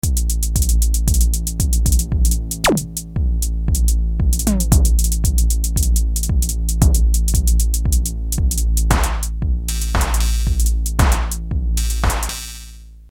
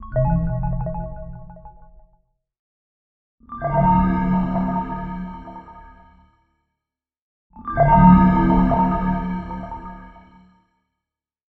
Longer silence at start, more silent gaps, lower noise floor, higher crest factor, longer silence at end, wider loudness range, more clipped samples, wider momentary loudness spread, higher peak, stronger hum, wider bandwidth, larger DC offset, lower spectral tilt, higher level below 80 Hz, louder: about the same, 0.05 s vs 0 s; second, none vs 2.59-3.38 s, 7.21-7.50 s; second, -37 dBFS vs -86 dBFS; about the same, 16 dB vs 20 dB; second, 0.1 s vs 1.5 s; second, 2 LU vs 12 LU; neither; second, 6 LU vs 24 LU; about the same, 0 dBFS vs -2 dBFS; neither; first, 17.5 kHz vs 4 kHz; neither; second, -4.5 dB/octave vs -11.5 dB/octave; first, -16 dBFS vs -32 dBFS; about the same, -18 LUFS vs -19 LUFS